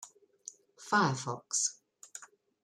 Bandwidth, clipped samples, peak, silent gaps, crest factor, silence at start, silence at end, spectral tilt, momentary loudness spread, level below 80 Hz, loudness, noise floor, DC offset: 15 kHz; under 0.1%; -16 dBFS; none; 20 dB; 0 s; 0.4 s; -3 dB/octave; 23 LU; -78 dBFS; -31 LUFS; -54 dBFS; under 0.1%